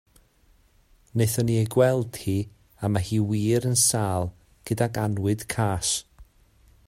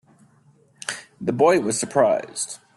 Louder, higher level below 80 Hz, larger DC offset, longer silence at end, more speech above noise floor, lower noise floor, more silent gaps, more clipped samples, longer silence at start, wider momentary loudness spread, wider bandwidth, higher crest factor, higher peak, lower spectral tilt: second, -25 LUFS vs -22 LUFS; first, -52 dBFS vs -64 dBFS; neither; first, 0.65 s vs 0.2 s; about the same, 37 dB vs 37 dB; about the same, -60 dBFS vs -57 dBFS; neither; neither; first, 1.15 s vs 0.9 s; second, 11 LU vs 14 LU; first, 16 kHz vs 12.5 kHz; about the same, 18 dB vs 20 dB; second, -8 dBFS vs -4 dBFS; about the same, -5 dB/octave vs -4 dB/octave